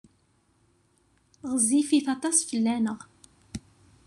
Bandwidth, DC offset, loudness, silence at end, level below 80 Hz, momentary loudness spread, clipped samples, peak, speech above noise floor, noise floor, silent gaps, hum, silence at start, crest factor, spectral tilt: 13 kHz; under 0.1%; -25 LUFS; 0.5 s; -62 dBFS; 20 LU; under 0.1%; -10 dBFS; 42 dB; -67 dBFS; none; none; 1.45 s; 20 dB; -3 dB/octave